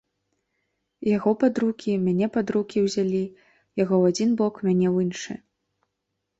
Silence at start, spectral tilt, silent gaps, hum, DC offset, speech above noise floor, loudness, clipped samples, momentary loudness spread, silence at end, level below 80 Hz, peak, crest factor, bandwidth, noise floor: 1 s; -6.5 dB/octave; none; none; under 0.1%; 57 dB; -23 LUFS; under 0.1%; 11 LU; 1.05 s; -64 dBFS; -8 dBFS; 16 dB; 8 kHz; -80 dBFS